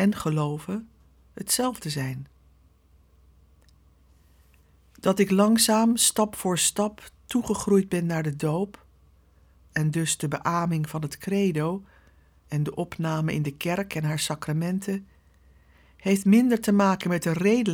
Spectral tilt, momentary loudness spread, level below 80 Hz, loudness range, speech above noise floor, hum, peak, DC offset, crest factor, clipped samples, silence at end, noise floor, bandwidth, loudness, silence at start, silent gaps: -4.5 dB/octave; 13 LU; -58 dBFS; 9 LU; 35 dB; none; -6 dBFS; under 0.1%; 20 dB; under 0.1%; 0 s; -59 dBFS; 20 kHz; -25 LUFS; 0 s; none